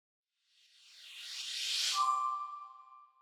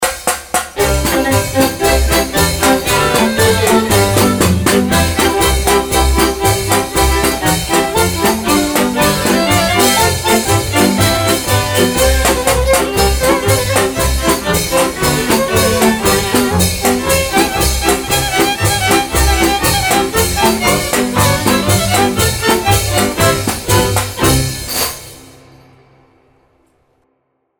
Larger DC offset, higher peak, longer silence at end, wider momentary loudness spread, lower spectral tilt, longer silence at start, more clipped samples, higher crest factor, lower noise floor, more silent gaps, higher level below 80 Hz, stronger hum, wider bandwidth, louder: neither; second, -22 dBFS vs 0 dBFS; second, 0.15 s vs 2.35 s; first, 22 LU vs 3 LU; second, 6 dB/octave vs -3.5 dB/octave; first, 0.85 s vs 0 s; neither; first, 18 dB vs 12 dB; first, -71 dBFS vs -64 dBFS; neither; second, under -90 dBFS vs -24 dBFS; neither; about the same, 19.5 kHz vs over 20 kHz; second, -34 LUFS vs -12 LUFS